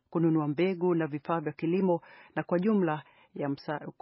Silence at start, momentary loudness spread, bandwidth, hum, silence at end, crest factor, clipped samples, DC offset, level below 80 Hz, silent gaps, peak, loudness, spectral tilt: 0.1 s; 10 LU; 5.8 kHz; none; 0.1 s; 16 dB; under 0.1%; under 0.1%; -78 dBFS; none; -14 dBFS; -30 LUFS; -7.5 dB/octave